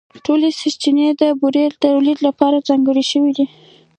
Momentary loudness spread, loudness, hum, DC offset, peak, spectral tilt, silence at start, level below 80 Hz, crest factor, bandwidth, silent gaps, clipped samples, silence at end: 4 LU; -15 LUFS; none; under 0.1%; 0 dBFS; -4 dB/octave; 0.15 s; -66 dBFS; 14 dB; 9.2 kHz; none; under 0.1%; 0.5 s